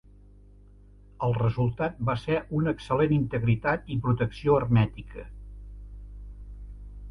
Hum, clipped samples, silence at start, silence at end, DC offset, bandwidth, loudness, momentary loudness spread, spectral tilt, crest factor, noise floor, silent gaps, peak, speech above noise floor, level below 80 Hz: 50 Hz at -40 dBFS; under 0.1%; 1.2 s; 0 s; under 0.1%; 6.4 kHz; -26 LUFS; 22 LU; -9 dB/octave; 18 dB; -52 dBFS; none; -10 dBFS; 26 dB; -44 dBFS